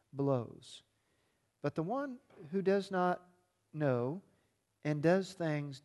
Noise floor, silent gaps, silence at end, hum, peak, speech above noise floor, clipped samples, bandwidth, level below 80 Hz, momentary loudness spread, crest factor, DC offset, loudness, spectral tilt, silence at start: -78 dBFS; none; 0.05 s; none; -18 dBFS; 43 dB; under 0.1%; 12 kHz; -78 dBFS; 17 LU; 20 dB; under 0.1%; -36 LUFS; -7.5 dB/octave; 0.15 s